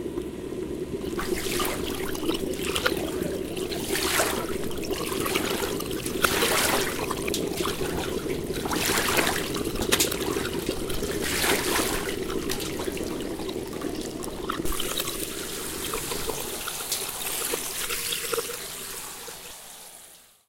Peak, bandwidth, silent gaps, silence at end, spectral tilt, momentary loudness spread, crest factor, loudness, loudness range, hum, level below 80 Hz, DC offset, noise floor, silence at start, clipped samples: -2 dBFS; 17 kHz; none; 0.25 s; -2.5 dB/octave; 11 LU; 26 dB; -27 LUFS; 5 LU; none; -44 dBFS; under 0.1%; -51 dBFS; 0 s; under 0.1%